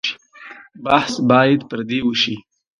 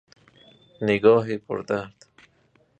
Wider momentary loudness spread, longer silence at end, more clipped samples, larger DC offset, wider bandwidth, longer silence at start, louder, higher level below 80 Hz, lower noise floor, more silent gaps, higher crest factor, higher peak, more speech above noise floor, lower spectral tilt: first, 23 LU vs 12 LU; second, 0.4 s vs 0.9 s; neither; neither; first, 10.5 kHz vs 8.2 kHz; second, 0.05 s vs 0.8 s; first, -17 LUFS vs -23 LUFS; first, -56 dBFS vs -62 dBFS; second, -41 dBFS vs -63 dBFS; neither; about the same, 18 dB vs 22 dB; first, 0 dBFS vs -4 dBFS; second, 24 dB vs 41 dB; second, -5 dB/octave vs -7 dB/octave